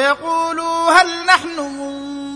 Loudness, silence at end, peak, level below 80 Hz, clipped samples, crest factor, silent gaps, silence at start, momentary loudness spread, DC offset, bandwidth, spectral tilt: -15 LUFS; 0 s; 0 dBFS; -56 dBFS; under 0.1%; 16 dB; none; 0 s; 14 LU; under 0.1%; 10.5 kHz; -1.5 dB/octave